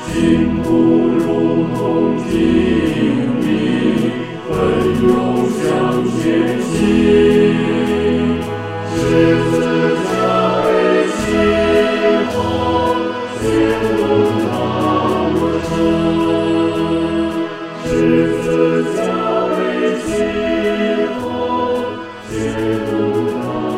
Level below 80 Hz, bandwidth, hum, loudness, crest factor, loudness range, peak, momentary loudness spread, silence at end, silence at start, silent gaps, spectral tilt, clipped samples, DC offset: -38 dBFS; 13.5 kHz; none; -15 LUFS; 14 dB; 3 LU; 0 dBFS; 6 LU; 0 s; 0 s; none; -6.5 dB/octave; under 0.1%; 0.3%